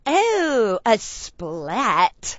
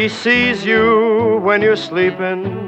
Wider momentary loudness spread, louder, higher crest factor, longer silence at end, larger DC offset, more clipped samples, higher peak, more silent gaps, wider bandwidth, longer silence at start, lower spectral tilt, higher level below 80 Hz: first, 13 LU vs 5 LU; second, -20 LUFS vs -14 LUFS; first, 18 dB vs 12 dB; about the same, 0 s vs 0 s; neither; neither; about the same, -2 dBFS vs -2 dBFS; neither; about the same, 8 kHz vs 8.4 kHz; about the same, 0.05 s vs 0 s; second, -3 dB/octave vs -5.5 dB/octave; about the same, -50 dBFS vs -48 dBFS